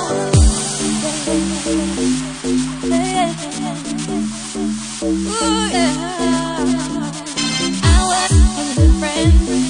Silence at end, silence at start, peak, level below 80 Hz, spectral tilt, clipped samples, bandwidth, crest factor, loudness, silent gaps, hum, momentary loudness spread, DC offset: 0 s; 0 s; 0 dBFS; -22 dBFS; -4.5 dB/octave; under 0.1%; 10.5 kHz; 16 dB; -17 LUFS; none; none; 9 LU; under 0.1%